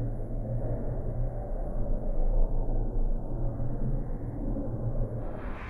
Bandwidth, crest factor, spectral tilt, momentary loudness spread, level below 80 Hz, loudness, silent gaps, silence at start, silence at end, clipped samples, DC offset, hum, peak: 2.7 kHz; 14 dB; -11 dB/octave; 4 LU; -30 dBFS; -35 LUFS; none; 0 s; 0 s; under 0.1%; under 0.1%; none; -14 dBFS